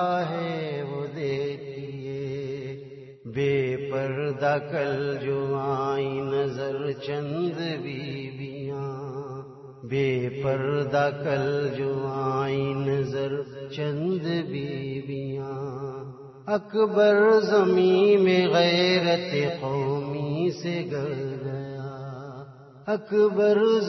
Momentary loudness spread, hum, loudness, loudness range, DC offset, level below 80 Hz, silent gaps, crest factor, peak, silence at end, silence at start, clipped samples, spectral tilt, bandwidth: 16 LU; none; -26 LUFS; 10 LU; under 0.1%; -64 dBFS; none; 16 dB; -10 dBFS; 0 s; 0 s; under 0.1%; -7 dB/octave; 6.2 kHz